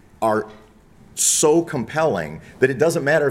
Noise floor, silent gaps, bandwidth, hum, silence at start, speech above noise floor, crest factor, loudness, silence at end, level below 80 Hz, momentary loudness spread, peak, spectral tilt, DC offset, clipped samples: -48 dBFS; none; 16.5 kHz; none; 0.2 s; 29 dB; 18 dB; -19 LUFS; 0 s; -54 dBFS; 13 LU; -2 dBFS; -3.5 dB/octave; under 0.1%; under 0.1%